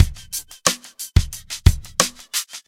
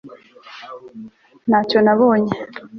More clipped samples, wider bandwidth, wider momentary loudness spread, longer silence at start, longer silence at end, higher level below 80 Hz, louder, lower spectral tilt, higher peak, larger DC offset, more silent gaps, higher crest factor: neither; first, 17 kHz vs 6.4 kHz; second, 11 LU vs 24 LU; about the same, 0 s vs 0.05 s; about the same, 0.1 s vs 0 s; first, -26 dBFS vs -60 dBFS; second, -21 LUFS vs -16 LUFS; second, -3 dB/octave vs -7.5 dB/octave; about the same, 0 dBFS vs -2 dBFS; neither; neither; about the same, 20 dB vs 16 dB